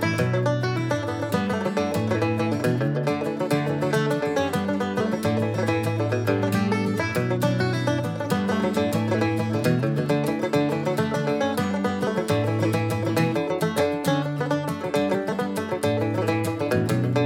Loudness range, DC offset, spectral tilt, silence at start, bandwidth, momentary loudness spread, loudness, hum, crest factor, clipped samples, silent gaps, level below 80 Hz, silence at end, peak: 1 LU; under 0.1%; -6.5 dB/octave; 0 s; 17 kHz; 3 LU; -24 LUFS; none; 14 dB; under 0.1%; none; -62 dBFS; 0 s; -8 dBFS